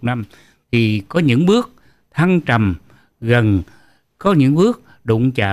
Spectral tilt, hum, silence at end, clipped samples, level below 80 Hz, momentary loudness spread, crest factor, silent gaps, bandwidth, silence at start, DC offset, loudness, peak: -7.5 dB/octave; none; 0 s; under 0.1%; -48 dBFS; 14 LU; 12 dB; none; 13 kHz; 0 s; under 0.1%; -16 LUFS; -4 dBFS